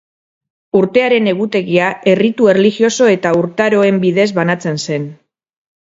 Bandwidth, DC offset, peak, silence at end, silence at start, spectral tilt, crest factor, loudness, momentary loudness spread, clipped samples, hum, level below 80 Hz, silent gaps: 7.8 kHz; under 0.1%; 0 dBFS; 0.85 s; 0.75 s; -5.5 dB/octave; 14 dB; -13 LUFS; 7 LU; under 0.1%; none; -58 dBFS; none